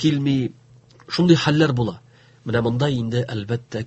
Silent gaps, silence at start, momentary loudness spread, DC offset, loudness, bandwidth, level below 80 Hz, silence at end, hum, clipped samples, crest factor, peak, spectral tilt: none; 0 s; 11 LU; under 0.1%; -21 LUFS; 8.4 kHz; -50 dBFS; 0 s; none; under 0.1%; 20 dB; -2 dBFS; -6.5 dB/octave